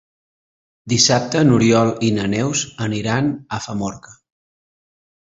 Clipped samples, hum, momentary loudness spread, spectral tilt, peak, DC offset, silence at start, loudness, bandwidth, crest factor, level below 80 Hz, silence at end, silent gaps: under 0.1%; none; 12 LU; -4.5 dB/octave; -2 dBFS; under 0.1%; 0.85 s; -18 LUFS; 8 kHz; 18 dB; -50 dBFS; 1.25 s; none